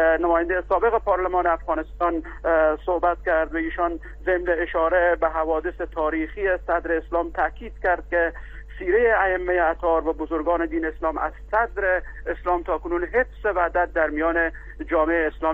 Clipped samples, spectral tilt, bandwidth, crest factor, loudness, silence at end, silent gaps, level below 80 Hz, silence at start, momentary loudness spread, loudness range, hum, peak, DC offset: under 0.1%; -8 dB/octave; 4.2 kHz; 16 dB; -23 LUFS; 0 s; none; -38 dBFS; 0 s; 6 LU; 2 LU; none; -6 dBFS; under 0.1%